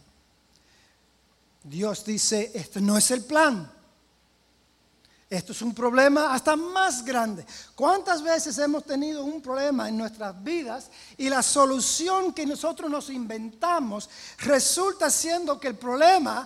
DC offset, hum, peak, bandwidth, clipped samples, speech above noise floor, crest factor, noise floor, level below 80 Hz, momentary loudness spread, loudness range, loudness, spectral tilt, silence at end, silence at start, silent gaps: under 0.1%; none; -6 dBFS; 16 kHz; under 0.1%; 39 dB; 20 dB; -64 dBFS; -64 dBFS; 14 LU; 3 LU; -24 LUFS; -2.5 dB/octave; 0 s; 1.65 s; none